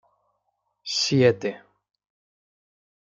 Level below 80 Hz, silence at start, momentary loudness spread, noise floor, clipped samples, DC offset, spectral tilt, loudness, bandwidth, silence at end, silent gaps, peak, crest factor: -70 dBFS; 0.85 s; 14 LU; -75 dBFS; under 0.1%; under 0.1%; -4.5 dB/octave; -22 LUFS; 9.2 kHz; 1.6 s; none; -6 dBFS; 22 dB